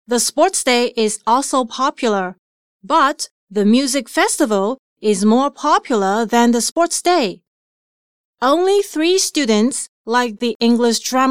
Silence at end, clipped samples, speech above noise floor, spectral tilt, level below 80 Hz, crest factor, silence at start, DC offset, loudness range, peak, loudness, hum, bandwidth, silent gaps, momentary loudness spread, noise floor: 0 s; under 0.1%; over 74 dB; -3 dB/octave; -64 dBFS; 14 dB; 0.1 s; 0.4%; 2 LU; -2 dBFS; -16 LUFS; none; 16 kHz; 2.39-2.80 s, 3.31-3.47 s, 4.79-4.96 s, 6.71-6.76 s, 7.47-8.33 s, 9.89-10.04 s, 10.55-10.60 s; 6 LU; under -90 dBFS